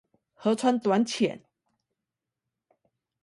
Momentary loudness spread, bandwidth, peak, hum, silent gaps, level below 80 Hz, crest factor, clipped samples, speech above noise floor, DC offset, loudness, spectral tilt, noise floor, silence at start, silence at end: 7 LU; 11.5 kHz; -12 dBFS; none; none; -76 dBFS; 18 dB; under 0.1%; 62 dB; under 0.1%; -26 LUFS; -5 dB/octave; -87 dBFS; 0.4 s; 1.85 s